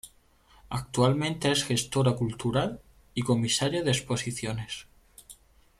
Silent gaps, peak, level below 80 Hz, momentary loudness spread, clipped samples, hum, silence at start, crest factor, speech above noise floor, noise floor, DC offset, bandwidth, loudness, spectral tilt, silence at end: none; -12 dBFS; -54 dBFS; 12 LU; under 0.1%; none; 0.05 s; 18 dB; 33 dB; -60 dBFS; under 0.1%; 14.5 kHz; -28 LUFS; -4.5 dB/octave; 0.45 s